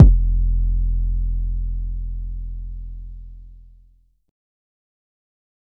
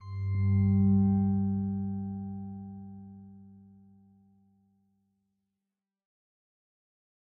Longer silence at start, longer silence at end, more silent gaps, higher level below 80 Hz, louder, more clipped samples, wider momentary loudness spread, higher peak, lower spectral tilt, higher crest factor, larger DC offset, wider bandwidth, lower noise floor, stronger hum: about the same, 0 s vs 0 s; second, 2.15 s vs 3.85 s; neither; first, -22 dBFS vs -60 dBFS; first, -24 LUFS vs -29 LUFS; first, 0.2% vs under 0.1%; second, 18 LU vs 22 LU; first, 0 dBFS vs -16 dBFS; about the same, -12.5 dB/octave vs -12.5 dB/octave; about the same, 20 dB vs 16 dB; neither; second, 0.9 kHz vs 2.2 kHz; second, -55 dBFS vs -89 dBFS; first, 60 Hz at -80 dBFS vs none